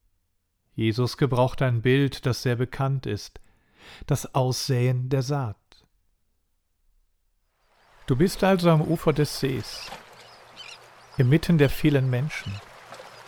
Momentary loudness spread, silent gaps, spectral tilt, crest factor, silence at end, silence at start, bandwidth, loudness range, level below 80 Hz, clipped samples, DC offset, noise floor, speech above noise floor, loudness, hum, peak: 21 LU; none; -6.5 dB/octave; 20 dB; 0.05 s; 0.75 s; 18 kHz; 5 LU; -46 dBFS; under 0.1%; under 0.1%; -73 dBFS; 49 dB; -24 LUFS; none; -6 dBFS